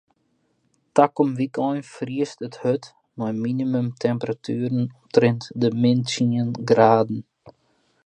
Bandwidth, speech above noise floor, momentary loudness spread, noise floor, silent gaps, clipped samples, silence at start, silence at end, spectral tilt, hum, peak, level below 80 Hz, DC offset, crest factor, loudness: 9.6 kHz; 47 dB; 11 LU; -68 dBFS; none; under 0.1%; 0.95 s; 0.55 s; -7 dB/octave; none; -2 dBFS; -66 dBFS; under 0.1%; 22 dB; -22 LUFS